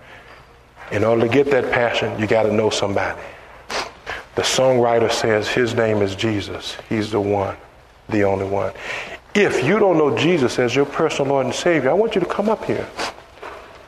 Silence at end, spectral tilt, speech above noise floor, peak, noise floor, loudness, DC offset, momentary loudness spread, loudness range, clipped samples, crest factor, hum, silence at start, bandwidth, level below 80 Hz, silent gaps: 0.05 s; -5 dB/octave; 27 dB; -2 dBFS; -45 dBFS; -19 LUFS; under 0.1%; 12 LU; 4 LU; under 0.1%; 18 dB; none; 0.05 s; 13.5 kHz; -50 dBFS; none